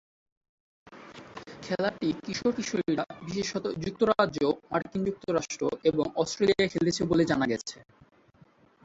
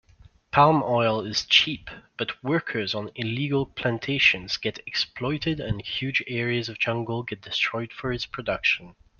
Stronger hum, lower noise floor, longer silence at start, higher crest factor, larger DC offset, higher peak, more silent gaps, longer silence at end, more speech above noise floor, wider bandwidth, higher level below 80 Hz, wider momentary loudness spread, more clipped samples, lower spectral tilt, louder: neither; first, -60 dBFS vs -55 dBFS; first, 0.9 s vs 0.55 s; about the same, 20 dB vs 22 dB; neither; second, -8 dBFS vs -4 dBFS; neither; first, 1.05 s vs 0.3 s; about the same, 32 dB vs 29 dB; first, 8 kHz vs 7.2 kHz; second, -60 dBFS vs -52 dBFS; about the same, 11 LU vs 11 LU; neither; about the same, -5 dB/octave vs -4.5 dB/octave; second, -28 LUFS vs -25 LUFS